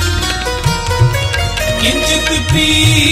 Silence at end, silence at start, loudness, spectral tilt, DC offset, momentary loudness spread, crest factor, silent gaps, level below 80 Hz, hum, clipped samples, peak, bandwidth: 0 s; 0 s; -12 LUFS; -3.5 dB/octave; under 0.1%; 7 LU; 12 dB; none; -24 dBFS; none; under 0.1%; 0 dBFS; 16 kHz